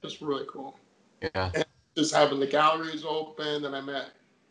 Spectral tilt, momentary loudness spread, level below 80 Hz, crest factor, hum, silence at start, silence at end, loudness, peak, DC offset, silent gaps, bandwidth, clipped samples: -4 dB/octave; 15 LU; -54 dBFS; 22 dB; none; 0.05 s; 0.4 s; -28 LUFS; -8 dBFS; under 0.1%; none; 10.5 kHz; under 0.1%